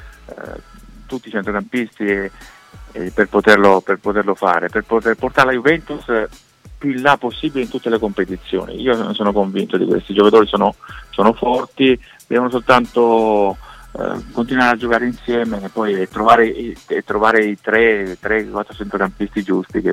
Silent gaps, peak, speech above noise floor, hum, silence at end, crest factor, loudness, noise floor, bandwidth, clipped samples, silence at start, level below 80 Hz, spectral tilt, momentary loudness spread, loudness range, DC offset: none; 0 dBFS; 23 dB; none; 0 s; 16 dB; -16 LUFS; -40 dBFS; 14 kHz; under 0.1%; 0 s; -42 dBFS; -6 dB/octave; 13 LU; 4 LU; under 0.1%